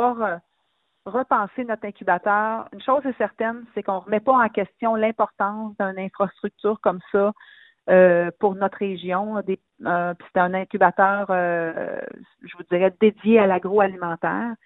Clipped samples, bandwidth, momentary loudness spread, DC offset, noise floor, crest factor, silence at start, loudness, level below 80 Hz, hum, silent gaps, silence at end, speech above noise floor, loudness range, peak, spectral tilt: under 0.1%; 4 kHz; 11 LU; under 0.1%; -71 dBFS; 20 dB; 0 s; -22 LUFS; -66 dBFS; none; none; 0.1 s; 50 dB; 3 LU; -2 dBFS; -10.5 dB/octave